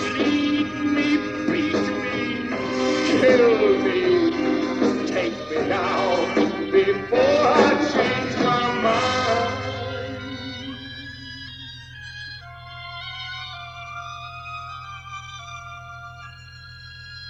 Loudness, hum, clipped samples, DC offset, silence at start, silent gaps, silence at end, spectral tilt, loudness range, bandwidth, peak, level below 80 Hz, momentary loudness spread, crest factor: -21 LUFS; none; under 0.1%; under 0.1%; 0 s; none; 0 s; -5 dB/octave; 15 LU; 8.6 kHz; -4 dBFS; -52 dBFS; 19 LU; 20 dB